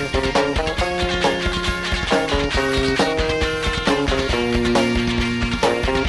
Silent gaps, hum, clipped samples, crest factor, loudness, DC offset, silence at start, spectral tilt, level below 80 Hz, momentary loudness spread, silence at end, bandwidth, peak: none; none; under 0.1%; 12 dB; -19 LUFS; under 0.1%; 0 s; -4.5 dB/octave; -28 dBFS; 3 LU; 0 s; 11.5 kHz; -6 dBFS